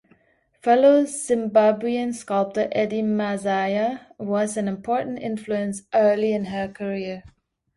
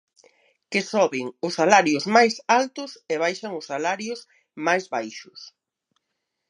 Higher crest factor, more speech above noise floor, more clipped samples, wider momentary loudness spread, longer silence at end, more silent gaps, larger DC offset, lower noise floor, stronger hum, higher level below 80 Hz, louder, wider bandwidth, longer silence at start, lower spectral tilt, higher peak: second, 16 dB vs 24 dB; second, 41 dB vs 57 dB; neither; second, 11 LU vs 18 LU; second, 0.5 s vs 1 s; neither; neither; second, -63 dBFS vs -80 dBFS; neither; first, -62 dBFS vs -78 dBFS; about the same, -22 LUFS vs -22 LUFS; about the same, 11.5 kHz vs 11.5 kHz; about the same, 0.65 s vs 0.7 s; first, -5.5 dB/octave vs -3.5 dB/octave; second, -6 dBFS vs 0 dBFS